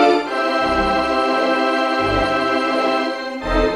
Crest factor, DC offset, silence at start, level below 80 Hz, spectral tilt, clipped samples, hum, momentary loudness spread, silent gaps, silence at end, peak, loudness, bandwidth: 16 dB; under 0.1%; 0 s; -34 dBFS; -5 dB/octave; under 0.1%; none; 3 LU; none; 0 s; -2 dBFS; -18 LUFS; 13.5 kHz